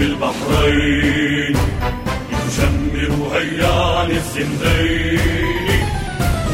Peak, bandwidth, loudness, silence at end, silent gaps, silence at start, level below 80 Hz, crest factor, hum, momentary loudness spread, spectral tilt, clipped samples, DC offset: -2 dBFS; 16.5 kHz; -17 LUFS; 0 s; none; 0 s; -24 dBFS; 14 dB; none; 6 LU; -5.5 dB/octave; under 0.1%; under 0.1%